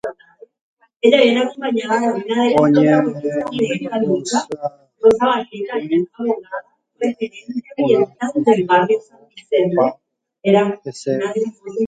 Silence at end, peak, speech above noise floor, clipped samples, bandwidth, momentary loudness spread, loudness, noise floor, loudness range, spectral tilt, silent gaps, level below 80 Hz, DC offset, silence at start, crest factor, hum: 0 s; 0 dBFS; 30 dB; under 0.1%; 9.4 kHz; 12 LU; -18 LUFS; -47 dBFS; 4 LU; -5.5 dB/octave; 0.61-0.77 s; -62 dBFS; under 0.1%; 0.05 s; 18 dB; none